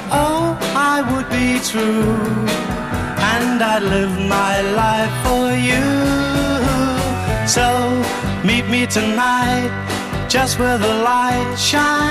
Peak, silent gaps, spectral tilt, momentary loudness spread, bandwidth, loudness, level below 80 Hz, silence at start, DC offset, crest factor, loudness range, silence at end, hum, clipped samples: -2 dBFS; none; -4.5 dB/octave; 4 LU; 15.5 kHz; -17 LUFS; -34 dBFS; 0 s; 0.1%; 14 dB; 1 LU; 0 s; none; under 0.1%